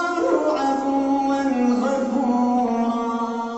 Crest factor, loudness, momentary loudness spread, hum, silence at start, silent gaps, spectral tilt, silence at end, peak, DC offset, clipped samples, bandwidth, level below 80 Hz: 12 dB; -21 LUFS; 3 LU; none; 0 s; none; -5.5 dB/octave; 0 s; -8 dBFS; under 0.1%; under 0.1%; 8.2 kHz; -58 dBFS